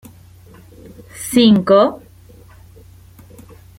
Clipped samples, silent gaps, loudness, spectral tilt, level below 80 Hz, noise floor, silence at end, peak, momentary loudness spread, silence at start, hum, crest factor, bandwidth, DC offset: under 0.1%; none; -13 LUFS; -5.5 dB/octave; -50 dBFS; -43 dBFS; 1.85 s; -2 dBFS; 26 LU; 1.15 s; none; 18 dB; 16.5 kHz; under 0.1%